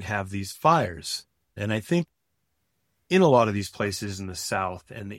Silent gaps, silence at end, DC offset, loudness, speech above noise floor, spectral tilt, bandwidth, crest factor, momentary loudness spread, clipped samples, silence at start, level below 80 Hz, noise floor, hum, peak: none; 0 s; under 0.1%; -25 LUFS; 52 dB; -5 dB/octave; 16.5 kHz; 20 dB; 14 LU; under 0.1%; 0 s; -58 dBFS; -77 dBFS; none; -6 dBFS